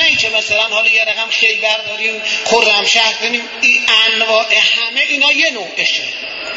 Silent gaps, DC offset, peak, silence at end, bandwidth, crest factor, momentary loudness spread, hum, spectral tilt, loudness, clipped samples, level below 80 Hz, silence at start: none; under 0.1%; 0 dBFS; 0 s; 8 kHz; 14 dB; 7 LU; none; 0 dB/octave; -11 LUFS; under 0.1%; -58 dBFS; 0 s